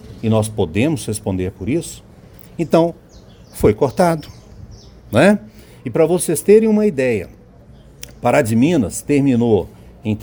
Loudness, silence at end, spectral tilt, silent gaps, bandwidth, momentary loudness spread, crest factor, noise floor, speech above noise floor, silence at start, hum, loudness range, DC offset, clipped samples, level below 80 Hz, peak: -17 LUFS; 0 s; -6 dB/octave; none; over 20 kHz; 18 LU; 16 dB; -43 dBFS; 28 dB; 0.05 s; none; 4 LU; under 0.1%; under 0.1%; -44 dBFS; 0 dBFS